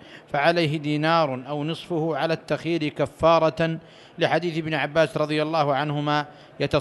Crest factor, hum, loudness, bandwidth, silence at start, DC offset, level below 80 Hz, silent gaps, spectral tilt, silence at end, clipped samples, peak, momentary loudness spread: 18 dB; none; -23 LUFS; 12 kHz; 0.05 s; under 0.1%; -54 dBFS; none; -6.5 dB/octave; 0 s; under 0.1%; -6 dBFS; 8 LU